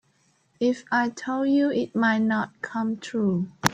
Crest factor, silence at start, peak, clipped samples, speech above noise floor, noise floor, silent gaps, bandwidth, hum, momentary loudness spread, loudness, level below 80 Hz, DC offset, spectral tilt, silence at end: 24 dB; 0.6 s; 0 dBFS; under 0.1%; 41 dB; -66 dBFS; none; 16.5 kHz; none; 6 LU; -25 LUFS; -66 dBFS; under 0.1%; -5.5 dB/octave; 0 s